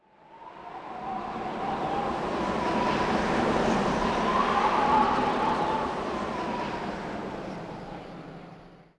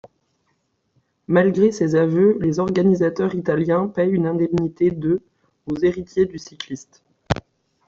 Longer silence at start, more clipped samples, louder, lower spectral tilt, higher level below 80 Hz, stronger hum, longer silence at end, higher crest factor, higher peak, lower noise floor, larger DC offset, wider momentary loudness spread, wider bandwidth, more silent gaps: second, 0.3 s vs 1.3 s; neither; second, -28 LUFS vs -20 LUFS; second, -5.5 dB/octave vs -7.5 dB/octave; about the same, -48 dBFS vs -52 dBFS; neither; second, 0.15 s vs 0.55 s; about the same, 16 dB vs 18 dB; second, -12 dBFS vs -2 dBFS; second, -49 dBFS vs -69 dBFS; neither; first, 17 LU vs 13 LU; first, 11 kHz vs 7.6 kHz; neither